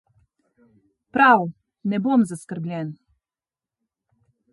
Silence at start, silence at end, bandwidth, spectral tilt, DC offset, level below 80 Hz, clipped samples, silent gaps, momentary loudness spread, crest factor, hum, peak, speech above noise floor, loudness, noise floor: 1.15 s; 1.6 s; 11.5 kHz; -6.5 dB/octave; under 0.1%; -70 dBFS; under 0.1%; none; 16 LU; 22 dB; none; -4 dBFS; over 70 dB; -21 LUFS; under -90 dBFS